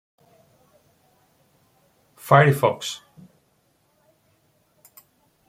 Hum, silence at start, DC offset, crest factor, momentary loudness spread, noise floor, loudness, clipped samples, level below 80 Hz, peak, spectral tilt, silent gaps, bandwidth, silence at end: none; 2.25 s; under 0.1%; 24 dB; 22 LU; -65 dBFS; -19 LUFS; under 0.1%; -66 dBFS; -2 dBFS; -6 dB/octave; none; 16 kHz; 2.55 s